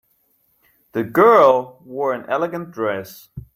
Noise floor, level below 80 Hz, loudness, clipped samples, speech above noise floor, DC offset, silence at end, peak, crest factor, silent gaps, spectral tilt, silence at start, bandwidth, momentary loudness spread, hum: -63 dBFS; -56 dBFS; -17 LUFS; under 0.1%; 45 dB; under 0.1%; 0.1 s; -2 dBFS; 18 dB; none; -6.5 dB/octave; 0.95 s; 16.5 kHz; 19 LU; none